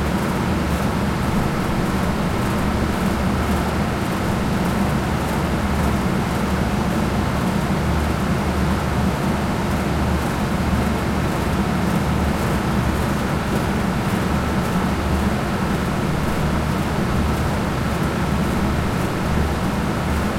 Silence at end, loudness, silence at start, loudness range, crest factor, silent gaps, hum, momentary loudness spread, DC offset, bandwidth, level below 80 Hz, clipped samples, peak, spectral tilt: 0 s; -21 LUFS; 0 s; 0 LU; 12 dB; none; none; 1 LU; under 0.1%; 16.5 kHz; -28 dBFS; under 0.1%; -8 dBFS; -6 dB/octave